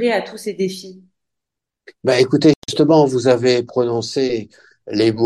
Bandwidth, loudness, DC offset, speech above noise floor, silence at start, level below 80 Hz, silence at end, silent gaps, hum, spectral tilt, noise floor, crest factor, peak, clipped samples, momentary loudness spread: 12.5 kHz; -17 LUFS; under 0.1%; 67 dB; 0 s; -58 dBFS; 0 s; 2.56-2.62 s; none; -5.5 dB/octave; -83 dBFS; 16 dB; -2 dBFS; under 0.1%; 11 LU